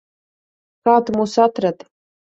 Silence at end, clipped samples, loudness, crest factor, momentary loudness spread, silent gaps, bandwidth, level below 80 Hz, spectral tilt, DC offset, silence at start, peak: 0.6 s; under 0.1%; -17 LUFS; 18 dB; 7 LU; none; 8 kHz; -62 dBFS; -6 dB/octave; under 0.1%; 0.85 s; -2 dBFS